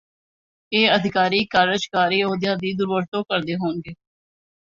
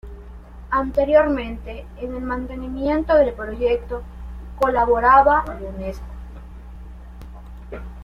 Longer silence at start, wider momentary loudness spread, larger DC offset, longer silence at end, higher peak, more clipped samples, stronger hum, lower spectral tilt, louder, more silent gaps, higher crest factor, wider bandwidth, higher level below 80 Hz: first, 0.7 s vs 0.05 s; second, 8 LU vs 24 LU; neither; first, 0.8 s vs 0 s; about the same, -2 dBFS vs -2 dBFS; neither; neither; second, -5 dB/octave vs -7.5 dB/octave; about the same, -20 LUFS vs -20 LUFS; first, 3.08-3.12 s vs none; about the same, 20 dB vs 18 dB; second, 7.6 kHz vs 11 kHz; second, -60 dBFS vs -34 dBFS